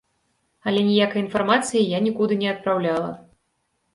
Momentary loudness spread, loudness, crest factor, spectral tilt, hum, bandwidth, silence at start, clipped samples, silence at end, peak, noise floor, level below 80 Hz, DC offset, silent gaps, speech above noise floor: 8 LU; -22 LUFS; 18 dB; -5 dB/octave; none; 11.5 kHz; 0.65 s; under 0.1%; 0.75 s; -4 dBFS; -72 dBFS; -64 dBFS; under 0.1%; none; 51 dB